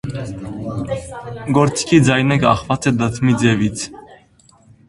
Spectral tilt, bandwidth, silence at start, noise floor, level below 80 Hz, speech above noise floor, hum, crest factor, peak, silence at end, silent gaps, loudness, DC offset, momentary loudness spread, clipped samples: -5.5 dB/octave; 11.5 kHz; 0.05 s; -51 dBFS; -42 dBFS; 34 dB; none; 18 dB; 0 dBFS; 0.75 s; none; -17 LUFS; under 0.1%; 14 LU; under 0.1%